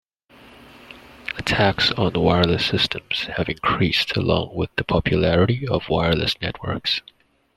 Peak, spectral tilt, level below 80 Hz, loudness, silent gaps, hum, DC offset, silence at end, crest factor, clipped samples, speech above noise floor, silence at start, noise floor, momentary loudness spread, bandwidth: -2 dBFS; -6 dB/octave; -42 dBFS; -21 LUFS; none; none; under 0.1%; 0.55 s; 20 dB; under 0.1%; 29 dB; 0.9 s; -50 dBFS; 8 LU; 13 kHz